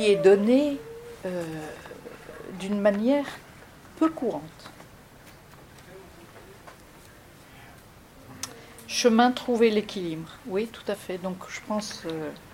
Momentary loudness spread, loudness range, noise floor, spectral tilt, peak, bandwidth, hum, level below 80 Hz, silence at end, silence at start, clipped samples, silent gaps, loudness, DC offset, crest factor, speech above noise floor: 27 LU; 22 LU; -50 dBFS; -5 dB/octave; -6 dBFS; 16.5 kHz; none; -60 dBFS; 0 s; 0 s; under 0.1%; none; -26 LUFS; under 0.1%; 22 dB; 25 dB